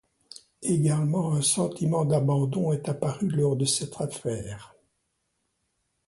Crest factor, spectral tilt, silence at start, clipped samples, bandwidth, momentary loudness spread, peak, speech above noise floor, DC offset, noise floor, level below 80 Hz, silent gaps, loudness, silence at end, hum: 16 dB; -5.5 dB/octave; 0.6 s; under 0.1%; 11.5 kHz; 9 LU; -12 dBFS; 51 dB; under 0.1%; -76 dBFS; -60 dBFS; none; -26 LUFS; 1.4 s; none